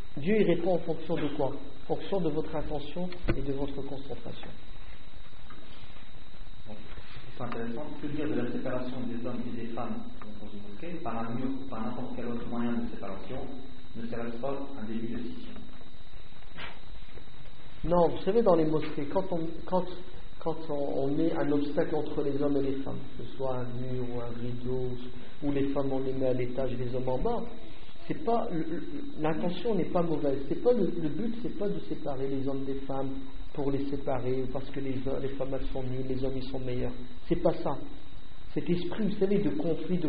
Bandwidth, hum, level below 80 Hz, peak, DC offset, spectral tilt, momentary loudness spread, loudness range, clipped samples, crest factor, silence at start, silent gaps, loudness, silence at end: 5 kHz; none; -46 dBFS; -10 dBFS; 4%; -6.5 dB/octave; 20 LU; 10 LU; under 0.1%; 20 dB; 0 s; none; -33 LUFS; 0 s